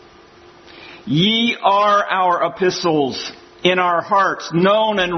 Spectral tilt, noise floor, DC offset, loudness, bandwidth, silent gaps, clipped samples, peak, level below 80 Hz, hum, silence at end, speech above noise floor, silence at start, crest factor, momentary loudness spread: -5 dB/octave; -45 dBFS; under 0.1%; -16 LUFS; 6.4 kHz; none; under 0.1%; 0 dBFS; -56 dBFS; none; 0 s; 29 dB; 0.7 s; 18 dB; 7 LU